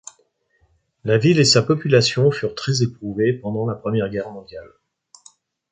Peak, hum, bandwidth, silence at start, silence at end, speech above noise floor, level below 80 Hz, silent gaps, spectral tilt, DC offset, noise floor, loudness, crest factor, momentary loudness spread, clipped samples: -2 dBFS; none; 9.4 kHz; 1.05 s; 1.05 s; 45 dB; -56 dBFS; none; -5 dB/octave; under 0.1%; -63 dBFS; -19 LUFS; 18 dB; 17 LU; under 0.1%